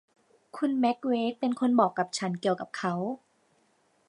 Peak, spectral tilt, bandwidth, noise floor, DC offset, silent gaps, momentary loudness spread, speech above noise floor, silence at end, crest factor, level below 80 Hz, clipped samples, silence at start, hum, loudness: -10 dBFS; -5.5 dB/octave; 11 kHz; -68 dBFS; under 0.1%; none; 9 LU; 41 dB; 0.9 s; 20 dB; -82 dBFS; under 0.1%; 0.55 s; none; -28 LUFS